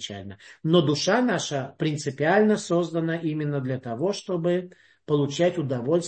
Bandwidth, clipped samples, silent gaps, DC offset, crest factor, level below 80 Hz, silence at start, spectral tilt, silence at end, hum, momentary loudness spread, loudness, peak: 8.8 kHz; under 0.1%; none; under 0.1%; 18 dB; -68 dBFS; 0 s; -5.5 dB/octave; 0 s; none; 9 LU; -25 LUFS; -8 dBFS